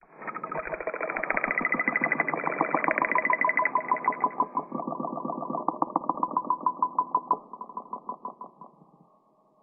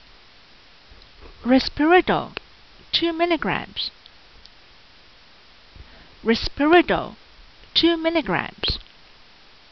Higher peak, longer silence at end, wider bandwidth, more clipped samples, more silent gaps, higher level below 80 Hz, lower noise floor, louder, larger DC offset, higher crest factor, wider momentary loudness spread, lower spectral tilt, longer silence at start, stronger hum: about the same, -6 dBFS vs -4 dBFS; about the same, 0.95 s vs 0.9 s; second, 2.8 kHz vs 6.2 kHz; neither; neither; second, -66 dBFS vs -44 dBFS; first, -64 dBFS vs -51 dBFS; second, -28 LUFS vs -21 LUFS; second, under 0.1% vs 0.2%; about the same, 22 dB vs 20 dB; about the same, 14 LU vs 13 LU; first, -8 dB/octave vs -2 dB/octave; second, 0.1 s vs 1.25 s; neither